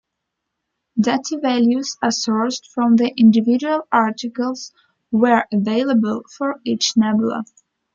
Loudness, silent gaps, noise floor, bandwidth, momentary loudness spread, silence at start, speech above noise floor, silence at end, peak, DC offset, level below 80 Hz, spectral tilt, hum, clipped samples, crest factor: -18 LUFS; none; -78 dBFS; 7.4 kHz; 10 LU; 0.95 s; 61 dB; 0.5 s; -2 dBFS; under 0.1%; -64 dBFS; -4.5 dB/octave; none; under 0.1%; 16 dB